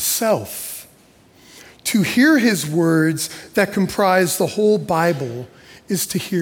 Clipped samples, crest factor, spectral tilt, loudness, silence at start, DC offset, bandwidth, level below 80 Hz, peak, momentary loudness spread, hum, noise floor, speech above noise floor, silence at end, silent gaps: under 0.1%; 14 dB; -4.5 dB/octave; -18 LUFS; 0 s; under 0.1%; 18 kHz; -56 dBFS; -4 dBFS; 14 LU; none; -51 dBFS; 33 dB; 0 s; none